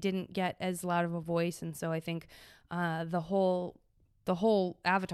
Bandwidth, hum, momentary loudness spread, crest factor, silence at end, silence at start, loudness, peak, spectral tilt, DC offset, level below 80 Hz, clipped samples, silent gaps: 14 kHz; none; 10 LU; 18 dB; 0 s; 0 s; -33 LUFS; -16 dBFS; -6 dB/octave; under 0.1%; -68 dBFS; under 0.1%; none